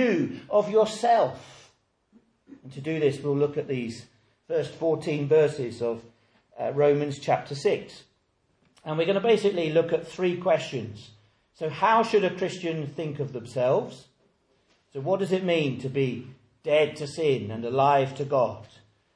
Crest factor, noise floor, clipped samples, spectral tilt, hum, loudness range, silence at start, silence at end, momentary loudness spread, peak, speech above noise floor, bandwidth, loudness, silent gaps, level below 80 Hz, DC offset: 18 dB; -70 dBFS; under 0.1%; -6 dB/octave; none; 3 LU; 0 s; 0.5 s; 13 LU; -8 dBFS; 45 dB; 10.5 kHz; -26 LUFS; none; -68 dBFS; under 0.1%